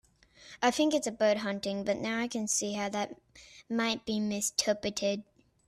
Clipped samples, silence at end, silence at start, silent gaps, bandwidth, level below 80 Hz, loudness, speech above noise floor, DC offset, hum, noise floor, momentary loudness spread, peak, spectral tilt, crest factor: under 0.1%; 0.45 s; 0.4 s; none; 14.5 kHz; -68 dBFS; -31 LUFS; 26 dB; under 0.1%; none; -57 dBFS; 8 LU; -14 dBFS; -3 dB/octave; 18 dB